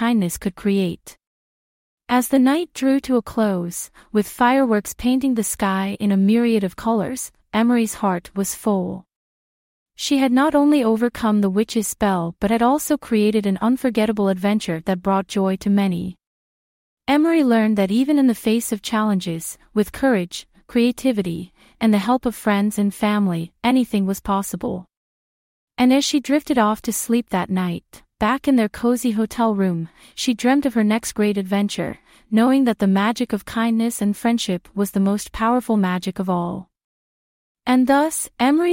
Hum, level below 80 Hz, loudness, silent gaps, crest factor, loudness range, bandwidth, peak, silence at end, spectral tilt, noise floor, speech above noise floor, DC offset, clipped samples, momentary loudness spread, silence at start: none; -50 dBFS; -20 LUFS; 1.27-1.98 s, 9.16-9.86 s, 16.27-16.97 s, 24.97-25.68 s, 36.84-37.55 s; 16 dB; 2 LU; 16.5 kHz; -4 dBFS; 0 s; -5.5 dB/octave; under -90 dBFS; over 71 dB; under 0.1%; under 0.1%; 9 LU; 0 s